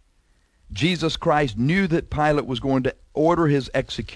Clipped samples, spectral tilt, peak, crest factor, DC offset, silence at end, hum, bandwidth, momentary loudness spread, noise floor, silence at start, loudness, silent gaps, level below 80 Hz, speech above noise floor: under 0.1%; -6.5 dB/octave; -6 dBFS; 16 dB; under 0.1%; 0 s; none; 11 kHz; 6 LU; -61 dBFS; 0.7 s; -22 LUFS; none; -42 dBFS; 40 dB